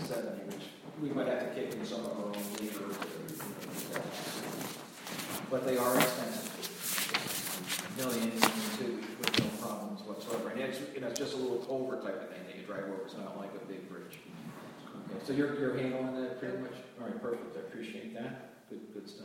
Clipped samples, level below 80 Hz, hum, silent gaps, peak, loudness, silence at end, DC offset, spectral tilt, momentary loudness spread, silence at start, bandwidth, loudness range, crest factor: under 0.1%; -76 dBFS; none; none; -6 dBFS; -36 LUFS; 0 s; under 0.1%; -3.5 dB/octave; 14 LU; 0 s; 17 kHz; 7 LU; 30 dB